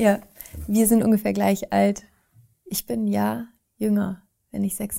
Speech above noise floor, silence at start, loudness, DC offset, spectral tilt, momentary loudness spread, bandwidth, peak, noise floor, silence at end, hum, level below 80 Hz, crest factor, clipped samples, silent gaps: 36 dB; 0 s; -23 LUFS; under 0.1%; -5.5 dB/octave; 17 LU; 16 kHz; -6 dBFS; -58 dBFS; 0 s; none; -50 dBFS; 18 dB; under 0.1%; none